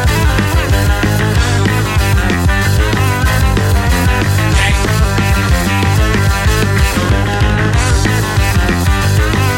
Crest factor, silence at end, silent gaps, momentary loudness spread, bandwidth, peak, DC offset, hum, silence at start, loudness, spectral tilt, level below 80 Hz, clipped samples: 10 dB; 0 s; none; 1 LU; 17 kHz; 0 dBFS; under 0.1%; none; 0 s; -12 LUFS; -5 dB/octave; -16 dBFS; under 0.1%